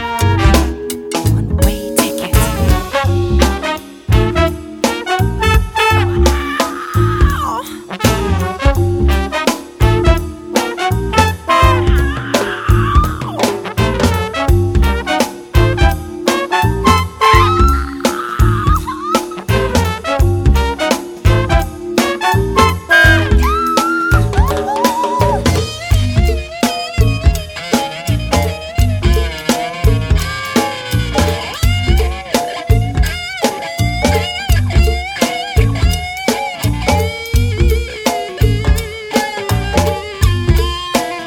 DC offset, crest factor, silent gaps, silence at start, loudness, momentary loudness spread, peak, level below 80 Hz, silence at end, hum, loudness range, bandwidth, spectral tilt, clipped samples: under 0.1%; 14 dB; none; 0 s; -14 LUFS; 6 LU; 0 dBFS; -18 dBFS; 0 s; none; 3 LU; 17.5 kHz; -5 dB/octave; under 0.1%